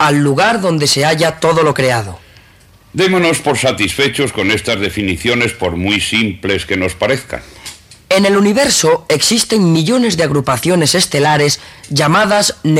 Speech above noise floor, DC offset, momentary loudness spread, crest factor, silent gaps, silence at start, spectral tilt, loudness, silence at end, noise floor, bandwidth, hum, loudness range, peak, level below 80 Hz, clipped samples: 32 dB; under 0.1%; 7 LU; 12 dB; none; 0 s; -4 dB/octave; -12 LUFS; 0 s; -44 dBFS; 16 kHz; none; 3 LU; -2 dBFS; -42 dBFS; under 0.1%